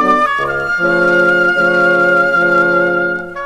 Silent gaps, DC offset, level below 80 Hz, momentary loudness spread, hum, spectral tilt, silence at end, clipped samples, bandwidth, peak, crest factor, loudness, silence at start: none; under 0.1%; -46 dBFS; 6 LU; none; -6 dB/octave; 0 s; under 0.1%; 12.5 kHz; 0 dBFS; 12 dB; -12 LUFS; 0 s